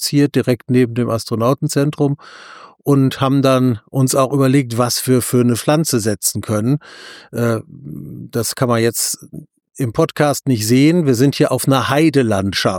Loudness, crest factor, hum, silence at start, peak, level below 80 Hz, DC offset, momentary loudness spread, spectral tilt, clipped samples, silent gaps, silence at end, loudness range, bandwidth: -16 LUFS; 14 dB; none; 0 s; -2 dBFS; -54 dBFS; under 0.1%; 11 LU; -5.5 dB/octave; under 0.1%; none; 0 s; 5 LU; 19.5 kHz